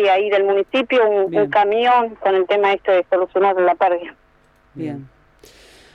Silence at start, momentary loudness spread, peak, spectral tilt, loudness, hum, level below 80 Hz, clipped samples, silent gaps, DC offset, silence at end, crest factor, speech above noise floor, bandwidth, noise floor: 0 s; 14 LU; -4 dBFS; -6 dB/octave; -17 LUFS; none; -58 dBFS; under 0.1%; none; under 0.1%; 0.9 s; 14 dB; 38 dB; 7.2 kHz; -55 dBFS